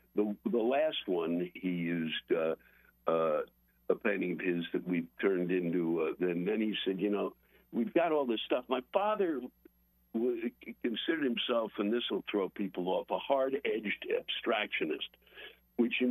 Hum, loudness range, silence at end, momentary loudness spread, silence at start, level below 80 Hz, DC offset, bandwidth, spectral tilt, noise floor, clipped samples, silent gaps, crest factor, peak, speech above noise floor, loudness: none; 2 LU; 0 s; 9 LU; 0.15 s; -74 dBFS; under 0.1%; 13 kHz; -8.5 dB/octave; -65 dBFS; under 0.1%; none; 18 dB; -14 dBFS; 32 dB; -33 LUFS